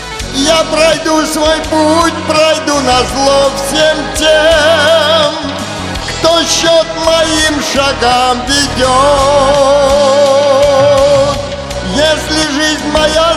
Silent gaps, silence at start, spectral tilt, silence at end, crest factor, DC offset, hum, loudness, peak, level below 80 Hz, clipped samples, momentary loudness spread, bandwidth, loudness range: none; 0 s; -3 dB/octave; 0 s; 10 dB; under 0.1%; none; -9 LUFS; 0 dBFS; -28 dBFS; under 0.1%; 5 LU; 15 kHz; 2 LU